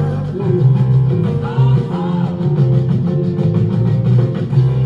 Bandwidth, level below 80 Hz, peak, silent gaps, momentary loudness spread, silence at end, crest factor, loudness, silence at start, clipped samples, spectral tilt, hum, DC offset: 4.8 kHz; -38 dBFS; -2 dBFS; none; 5 LU; 0 s; 12 dB; -15 LUFS; 0 s; under 0.1%; -10.5 dB/octave; none; under 0.1%